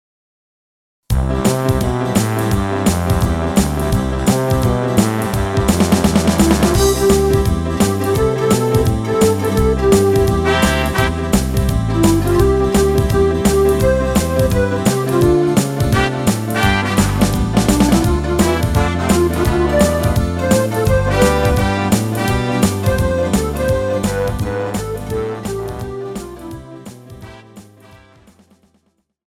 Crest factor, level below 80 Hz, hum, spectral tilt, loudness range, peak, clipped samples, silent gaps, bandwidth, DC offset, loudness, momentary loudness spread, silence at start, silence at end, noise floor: 14 dB; -24 dBFS; none; -5.5 dB/octave; 7 LU; 0 dBFS; under 0.1%; none; 17 kHz; under 0.1%; -15 LUFS; 7 LU; 1.1 s; 1.35 s; -63 dBFS